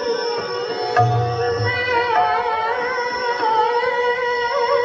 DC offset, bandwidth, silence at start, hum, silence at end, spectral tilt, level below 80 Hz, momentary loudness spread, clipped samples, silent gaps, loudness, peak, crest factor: under 0.1%; 7.8 kHz; 0 s; none; 0 s; -2.5 dB/octave; -56 dBFS; 5 LU; under 0.1%; none; -19 LUFS; -4 dBFS; 16 dB